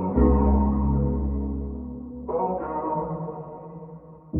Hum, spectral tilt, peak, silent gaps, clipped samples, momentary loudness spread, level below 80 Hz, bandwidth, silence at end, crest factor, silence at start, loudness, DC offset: none; -13.5 dB/octave; -8 dBFS; none; under 0.1%; 20 LU; -30 dBFS; 2.5 kHz; 0 s; 18 dB; 0 s; -25 LUFS; under 0.1%